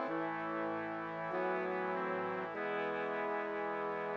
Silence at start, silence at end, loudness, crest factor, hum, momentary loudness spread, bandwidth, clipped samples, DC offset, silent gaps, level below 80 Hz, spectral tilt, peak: 0 s; 0 s; -38 LUFS; 14 dB; none; 3 LU; 7.4 kHz; under 0.1%; under 0.1%; none; -78 dBFS; -7.5 dB/octave; -24 dBFS